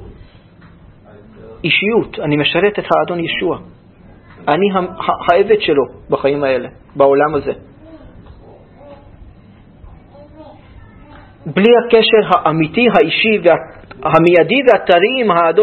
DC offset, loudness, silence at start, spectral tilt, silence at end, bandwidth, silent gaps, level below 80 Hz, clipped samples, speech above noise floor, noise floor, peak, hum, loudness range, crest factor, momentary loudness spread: under 0.1%; -13 LUFS; 0 s; -7.5 dB/octave; 0 s; 5.2 kHz; none; -46 dBFS; under 0.1%; 29 dB; -42 dBFS; 0 dBFS; none; 8 LU; 14 dB; 11 LU